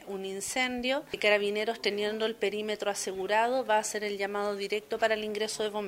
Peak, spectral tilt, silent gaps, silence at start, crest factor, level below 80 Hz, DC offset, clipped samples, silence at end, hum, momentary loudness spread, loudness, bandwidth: -12 dBFS; -2.5 dB/octave; none; 0 s; 20 dB; -68 dBFS; under 0.1%; under 0.1%; 0 s; none; 6 LU; -30 LUFS; 16 kHz